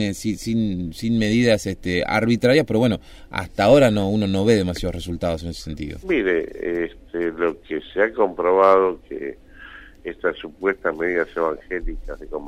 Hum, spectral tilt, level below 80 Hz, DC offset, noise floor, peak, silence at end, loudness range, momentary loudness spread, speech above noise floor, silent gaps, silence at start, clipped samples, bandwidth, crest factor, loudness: none; -6 dB/octave; -40 dBFS; under 0.1%; -42 dBFS; -4 dBFS; 0 s; 6 LU; 15 LU; 21 dB; none; 0 s; under 0.1%; 16 kHz; 18 dB; -21 LUFS